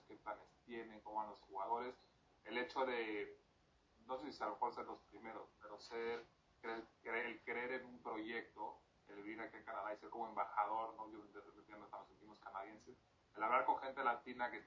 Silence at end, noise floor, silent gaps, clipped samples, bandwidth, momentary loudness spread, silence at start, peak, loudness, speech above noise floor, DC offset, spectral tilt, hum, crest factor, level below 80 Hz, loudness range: 0 s; -75 dBFS; none; under 0.1%; 7.2 kHz; 16 LU; 0.1 s; -24 dBFS; -46 LUFS; 29 dB; under 0.1%; -1.5 dB/octave; none; 24 dB; -80 dBFS; 3 LU